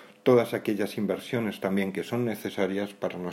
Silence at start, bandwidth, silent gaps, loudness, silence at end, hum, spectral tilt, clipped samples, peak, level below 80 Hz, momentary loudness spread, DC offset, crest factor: 0 s; 16 kHz; none; -28 LUFS; 0 s; none; -6.5 dB/octave; under 0.1%; -8 dBFS; -72 dBFS; 8 LU; under 0.1%; 20 dB